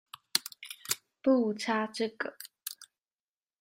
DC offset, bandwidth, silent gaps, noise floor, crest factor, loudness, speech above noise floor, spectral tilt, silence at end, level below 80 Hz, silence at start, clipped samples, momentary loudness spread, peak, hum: under 0.1%; 16 kHz; none; under -90 dBFS; 28 dB; -32 LUFS; over 60 dB; -2.5 dB/octave; 0.75 s; -80 dBFS; 0.35 s; under 0.1%; 15 LU; -6 dBFS; none